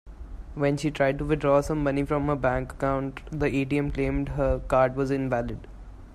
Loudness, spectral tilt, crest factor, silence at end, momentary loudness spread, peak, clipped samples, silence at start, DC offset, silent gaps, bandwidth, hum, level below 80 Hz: -26 LUFS; -7.5 dB/octave; 16 dB; 0 s; 12 LU; -10 dBFS; under 0.1%; 0.05 s; under 0.1%; none; 13 kHz; none; -38 dBFS